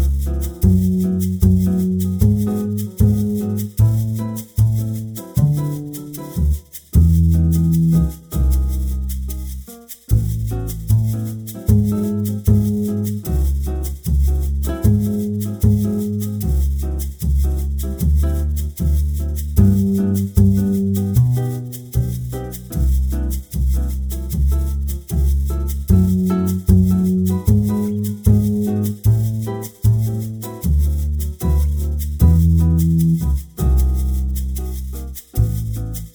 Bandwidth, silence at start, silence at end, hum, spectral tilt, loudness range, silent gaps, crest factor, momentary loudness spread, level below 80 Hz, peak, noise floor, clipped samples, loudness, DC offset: over 20 kHz; 0 s; 0.05 s; none; -8 dB/octave; 4 LU; none; 16 dB; 10 LU; -22 dBFS; 0 dBFS; -37 dBFS; under 0.1%; -19 LUFS; under 0.1%